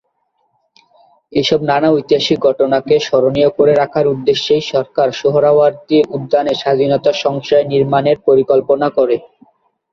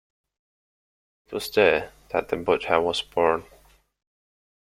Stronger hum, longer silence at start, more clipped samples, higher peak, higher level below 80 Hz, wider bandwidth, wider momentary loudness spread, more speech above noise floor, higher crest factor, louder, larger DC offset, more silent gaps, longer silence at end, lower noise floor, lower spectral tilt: neither; about the same, 1.3 s vs 1.3 s; neither; first, 0 dBFS vs -4 dBFS; about the same, -54 dBFS vs -56 dBFS; second, 7.4 kHz vs 16 kHz; second, 4 LU vs 10 LU; first, 51 dB vs 34 dB; second, 14 dB vs 24 dB; first, -13 LUFS vs -24 LUFS; neither; neither; second, 0.65 s vs 1.2 s; first, -64 dBFS vs -57 dBFS; first, -6 dB/octave vs -4 dB/octave